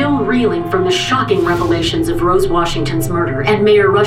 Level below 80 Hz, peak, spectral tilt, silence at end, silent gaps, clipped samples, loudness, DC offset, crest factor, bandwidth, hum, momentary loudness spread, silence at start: -30 dBFS; -2 dBFS; -5.5 dB/octave; 0 s; none; under 0.1%; -14 LUFS; under 0.1%; 10 dB; 15.5 kHz; none; 6 LU; 0 s